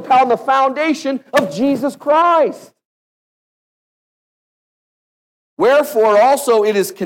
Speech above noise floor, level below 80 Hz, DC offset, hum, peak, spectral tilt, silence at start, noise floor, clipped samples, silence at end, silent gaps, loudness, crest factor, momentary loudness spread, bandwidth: over 76 dB; -66 dBFS; under 0.1%; none; -2 dBFS; -4 dB/octave; 0 s; under -90 dBFS; under 0.1%; 0 s; 2.85-5.57 s; -14 LUFS; 14 dB; 6 LU; 17 kHz